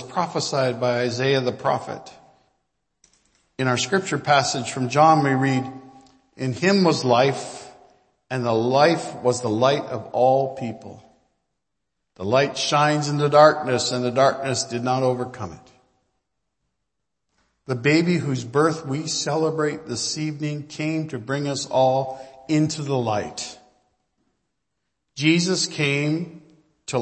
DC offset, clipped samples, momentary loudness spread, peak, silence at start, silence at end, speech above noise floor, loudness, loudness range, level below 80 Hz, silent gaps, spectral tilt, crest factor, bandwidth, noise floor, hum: under 0.1%; under 0.1%; 13 LU; 0 dBFS; 0 s; 0 s; 60 dB; -21 LUFS; 6 LU; -64 dBFS; none; -5 dB/octave; 22 dB; 8.8 kHz; -81 dBFS; none